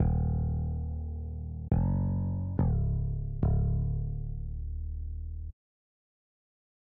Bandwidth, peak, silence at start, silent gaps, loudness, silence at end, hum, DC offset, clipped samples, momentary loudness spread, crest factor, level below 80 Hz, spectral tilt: 2 kHz; -16 dBFS; 0 s; none; -33 LUFS; 1.35 s; none; under 0.1%; under 0.1%; 10 LU; 14 dB; -36 dBFS; -12 dB/octave